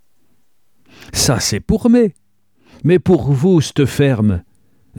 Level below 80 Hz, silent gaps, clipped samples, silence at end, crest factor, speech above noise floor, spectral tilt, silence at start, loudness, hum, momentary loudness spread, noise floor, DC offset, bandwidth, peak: -38 dBFS; none; under 0.1%; 0.6 s; 14 dB; 51 dB; -5.5 dB/octave; 1.15 s; -15 LUFS; none; 6 LU; -65 dBFS; 0.2%; 19 kHz; -2 dBFS